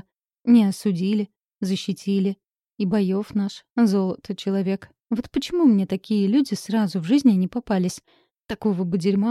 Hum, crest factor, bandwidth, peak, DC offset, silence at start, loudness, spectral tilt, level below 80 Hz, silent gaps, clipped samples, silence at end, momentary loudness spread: none; 16 dB; 13 kHz; -6 dBFS; under 0.1%; 0.45 s; -22 LUFS; -7 dB/octave; -58 dBFS; none; under 0.1%; 0 s; 11 LU